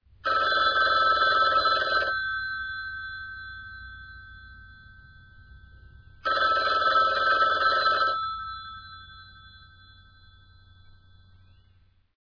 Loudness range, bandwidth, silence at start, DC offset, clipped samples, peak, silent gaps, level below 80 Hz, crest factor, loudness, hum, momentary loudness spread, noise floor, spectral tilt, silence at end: 16 LU; 5.4 kHz; 0.25 s; under 0.1%; under 0.1%; -10 dBFS; none; -54 dBFS; 18 dB; -23 LUFS; none; 22 LU; -61 dBFS; -3 dB/octave; 2.65 s